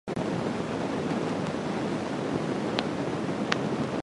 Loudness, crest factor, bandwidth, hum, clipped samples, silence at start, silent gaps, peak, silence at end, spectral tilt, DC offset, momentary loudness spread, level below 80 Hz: -30 LUFS; 26 dB; 11.5 kHz; none; under 0.1%; 0.05 s; none; -4 dBFS; 0 s; -6 dB/octave; under 0.1%; 2 LU; -56 dBFS